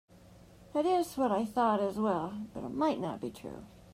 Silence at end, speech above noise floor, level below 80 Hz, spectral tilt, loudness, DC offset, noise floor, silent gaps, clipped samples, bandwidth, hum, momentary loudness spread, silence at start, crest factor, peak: 0 s; 25 dB; -64 dBFS; -6.5 dB/octave; -32 LUFS; under 0.1%; -56 dBFS; none; under 0.1%; 15.5 kHz; none; 12 LU; 0.3 s; 16 dB; -16 dBFS